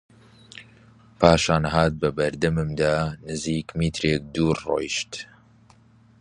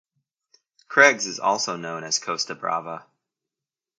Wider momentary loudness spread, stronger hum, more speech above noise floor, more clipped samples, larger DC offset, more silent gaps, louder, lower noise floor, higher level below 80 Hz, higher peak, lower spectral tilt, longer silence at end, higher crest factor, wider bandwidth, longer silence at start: first, 20 LU vs 14 LU; neither; second, 32 dB vs 67 dB; neither; neither; neither; about the same, -23 LUFS vs -22 LUFS; second, -54 dBFS vs -90 dBFS; first, -42 dBFS vs -78 dBFS; about the same, 0 dBFS vs 0 dBFS; first, -5.5 dB/octave vs -1.5 dB/octave; about the same, 0.95 s vs 0.95 s; about the same, 24 dB vs 26 dB; about the same, 11 kHz vs 10 kHz; second, 0.55 s vs 0.9 s